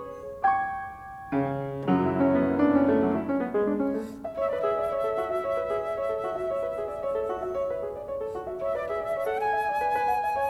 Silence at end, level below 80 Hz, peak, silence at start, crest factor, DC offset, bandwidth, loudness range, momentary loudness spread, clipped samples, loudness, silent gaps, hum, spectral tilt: 0 s; -56 dBFS; -10 dBFS; 0 s; 16 dB; under 0.1%; 13 kHz; 5 LU; 10 LU; under 0.1%; -28 LUFS; none; none; -8 dB/octave